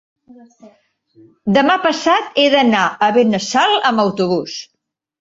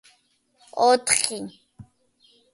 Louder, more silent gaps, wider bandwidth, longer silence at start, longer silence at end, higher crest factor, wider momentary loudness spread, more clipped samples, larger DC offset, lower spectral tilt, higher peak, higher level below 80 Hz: first, -14 LUFS vs -20 LUFS; neither; second, 7.8 kHz vs 12 kHz; about the same, 0.65 s vs 0.75 s; second, 0.55 s vs 0.7 s; second, 16 dB vs 24 dB; second, 8 LU vs 18 LU; neither; neither; first, -4 dB/octave vs -1 dB/octave; about the same, 0 dBFS vs -2 dBFS; first, -58 dBFS vs -64 dBFS